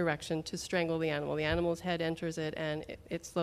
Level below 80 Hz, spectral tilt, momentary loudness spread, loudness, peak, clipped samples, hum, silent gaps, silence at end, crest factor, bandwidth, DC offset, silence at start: -54 dBFS; -5 dB/octave; 6 LU; -35 LUFS; -18 dBFS; under 0.1%; none; none; 0 s; 16 dB; 15 kHz; under 0.1%; 0 s